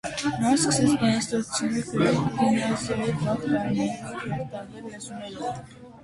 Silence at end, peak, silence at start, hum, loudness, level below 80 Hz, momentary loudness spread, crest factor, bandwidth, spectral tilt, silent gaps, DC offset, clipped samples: 0 s; -10 dBFS; 0.05 s; none; -25 LUFS; -54 dBFS; 16 LU; 16 dB; 11.5 kHz; -5 dB/octave; none; under 0.1%; under 0.1%